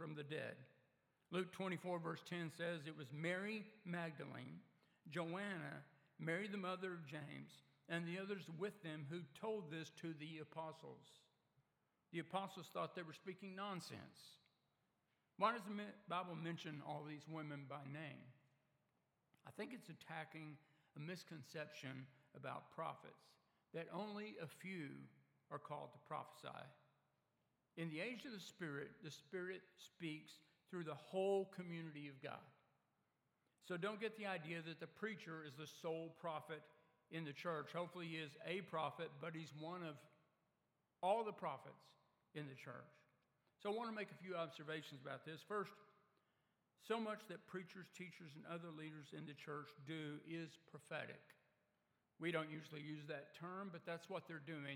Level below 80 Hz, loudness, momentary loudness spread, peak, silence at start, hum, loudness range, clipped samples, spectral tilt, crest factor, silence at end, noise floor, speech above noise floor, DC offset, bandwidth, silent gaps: under -90 dBFS; -50 LUFS; 12 LU; -26 dBFS; 0 s; none; 6 LU; under 0.1%; -6 dB/octave; 24 dB; 0 s; -87 dBFS; 38 dB; under 0.1%; 17 kHz; none